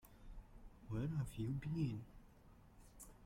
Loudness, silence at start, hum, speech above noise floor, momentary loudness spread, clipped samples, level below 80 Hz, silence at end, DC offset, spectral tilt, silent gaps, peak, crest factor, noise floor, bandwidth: -44 LUFS; 0.05 s; none; 22 dB; 24 LU; under 0.1%; -60 dBFS; 0 s; under 0.1%; -7.5 dB/octave; none; -30 dBFS; 16 dB; -64 dBFS; 16.5 kHz